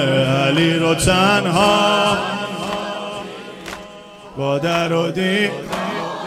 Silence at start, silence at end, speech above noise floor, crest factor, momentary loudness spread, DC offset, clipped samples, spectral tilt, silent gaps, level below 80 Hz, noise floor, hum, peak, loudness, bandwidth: 0 s; 0 s; 22 dB; 18 dB; 18 LU; under 0.1%; under 0.1%; -4.5 dB/octave; none; -42 dBFS; -38 dBFS; none; -2 dBFS; -17 LUFS; 16 kHz